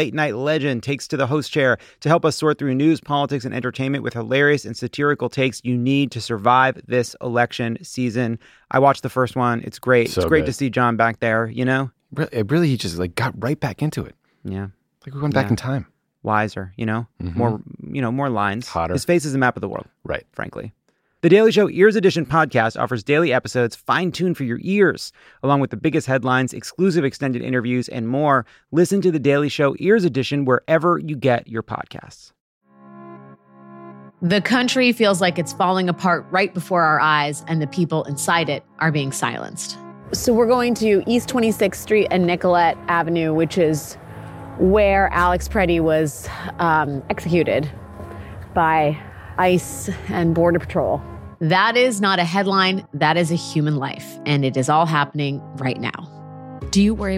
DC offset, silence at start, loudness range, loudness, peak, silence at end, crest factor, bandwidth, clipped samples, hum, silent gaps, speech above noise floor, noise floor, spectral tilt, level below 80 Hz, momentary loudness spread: under 0.1%; 0 s; 5 LU; -19 LUFS; -2 dBFS; 0 s; 18 dB; 16 kHz; under 0.1%; none; 32.40-32.61 s; 25 dB; -44 dBFS; -5.5 dB/octave; -44 dBFS; 12 LU